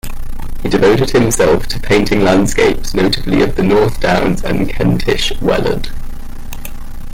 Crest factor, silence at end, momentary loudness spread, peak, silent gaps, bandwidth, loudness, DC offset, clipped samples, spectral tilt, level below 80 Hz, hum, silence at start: 10 dB; 0 s; 18 LU; -2 dBFS; none; 16.5 kHz; -13 LUFS; under 0.1%; under 0.1%; -5 dB/octave; -22 dBFS; none; 0.05 s